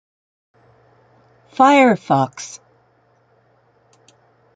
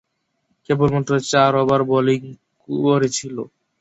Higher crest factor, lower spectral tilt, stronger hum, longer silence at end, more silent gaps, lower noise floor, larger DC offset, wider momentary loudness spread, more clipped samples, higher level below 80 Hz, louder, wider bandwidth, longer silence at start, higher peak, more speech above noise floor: about the same, 20 dB vs 16 dB; about the same, -5.5 dB/octave vs -5.5 dB/octave; neither; first, 2 s vs 0.35 s; neither; second, -58 dBFS vs -70 dBFS; neither; first, 24 LU vs 13 LU; neither; second, -68 dBFS vs -54 dBFS; first, -15 LUFS vs -18 LUFS; first, 9.4 kHz vs 8 kHz; first, 1.6 s vs 0.7 s; about the same, 0 dBFS vs -2 dBFS; second, 44 dB vs 52 dB